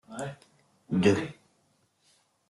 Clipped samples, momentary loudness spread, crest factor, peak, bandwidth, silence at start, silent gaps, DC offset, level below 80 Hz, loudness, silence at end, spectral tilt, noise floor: under 0.1%; 16 LU; 24 dB; -8 dBFS; 12 kHz; 0.1 s; none; under 0.1%; -66 dBFS; -29 LUFS; 1.15 s; -6.5 dB/octave; -70 dBFS